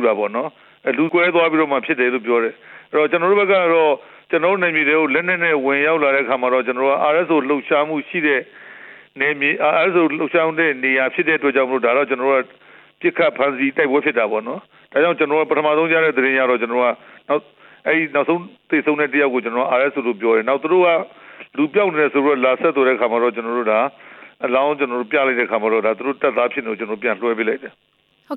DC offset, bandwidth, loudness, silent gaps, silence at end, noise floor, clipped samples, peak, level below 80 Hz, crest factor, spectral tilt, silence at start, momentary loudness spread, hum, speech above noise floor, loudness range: under 0.1%; 4.2 kHz; -17 LUFS; none; 0 s; -41 dBFS; under 0.1%; -4 dBFS; -70 dBFS; 14 dB; -8.5 dB/octave; 0 s; 8 LU; none; 23 dB; 3 LU